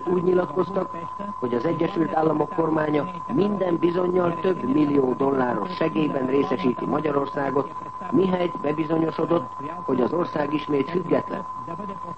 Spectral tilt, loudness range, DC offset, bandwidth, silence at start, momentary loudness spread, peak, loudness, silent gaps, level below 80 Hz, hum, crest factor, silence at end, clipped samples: -8.5 dB/octave; 2 LU; 0.4%; 8.2 kHz; 0 s; 10 LU; -8 dBFS; -24 LUFS; none; -58 dBFS; none; 16 dB; 0 s; under 0.1%